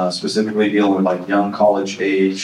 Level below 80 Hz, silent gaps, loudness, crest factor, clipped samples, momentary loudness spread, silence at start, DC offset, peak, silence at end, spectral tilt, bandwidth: -70 dBFS; none; -17 LUFS; 14 dB; under 0.1%; 4 LU; 0 s; under 0.1%; -2 dBFS; 0 s; -5.5 dB/octave; 11.5 kHz